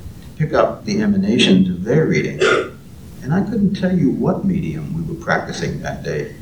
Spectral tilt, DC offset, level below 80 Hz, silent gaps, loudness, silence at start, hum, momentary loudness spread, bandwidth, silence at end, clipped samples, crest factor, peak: -6 dB/octave; 0.4%; -42 dBFS; none; -18 LUFS; 0 s; none; 11 LU; 10.5 kHz; 0 s; under 0.1%; 18 dB; 0 dBFS